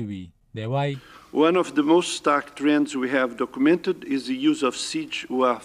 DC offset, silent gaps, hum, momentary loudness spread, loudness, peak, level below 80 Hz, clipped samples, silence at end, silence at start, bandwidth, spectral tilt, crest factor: under 0.1%; none; none; 10 LU; -23 LUFS; -8 dBFS; -64 dBFS; under 0.1%; 0 s; 0 s; 12 kHz; -5 dB/octave; 16 dB